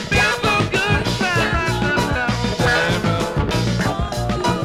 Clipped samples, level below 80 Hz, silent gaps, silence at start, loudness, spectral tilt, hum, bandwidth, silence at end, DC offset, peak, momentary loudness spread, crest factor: under 0.1%; -30 dBFS; none; 0 s; -18 LUFS; -5 dB/octave; none; 15.5 kHz; 0 s; 0.2%; -4 dBFS; 4 LU; 14 dB